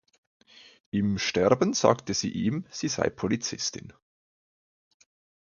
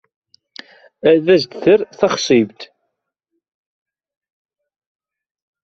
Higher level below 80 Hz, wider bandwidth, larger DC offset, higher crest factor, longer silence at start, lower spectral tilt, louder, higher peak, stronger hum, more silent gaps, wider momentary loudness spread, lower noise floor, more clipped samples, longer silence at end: about the same, -56 dBFS vs -60 dBFS; about the same, 7.4 kHz vs 7.8 kHz; neither; first, 24 dB vs 18 dB; about the same, 0.95 s vs 1.05 s; about the same, -4.5 dB/octave vs -5 dB/octave; second, -27 LUFS vs -15 LUFS; about the same, -4 dBFS vs -2 dBFS; neither; neither; first, 9 LU vs 6 LU; first, under -90 dBFS vs -76 dBFS; neither; second, 1.5 s vs 3 s